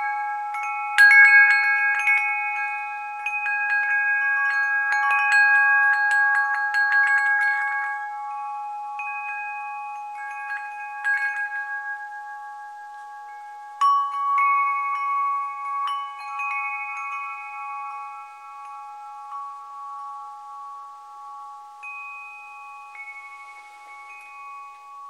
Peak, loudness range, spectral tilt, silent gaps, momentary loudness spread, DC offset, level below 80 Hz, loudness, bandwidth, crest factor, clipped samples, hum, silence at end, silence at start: -4 dBFS; 20 LU; 4.5 dB/octave; none; 23 LU; under 0.1%; -84 dBFS; -20 LUFS; 14 kHz; 20 dB; under 0.1%; none; 0 s; 0 s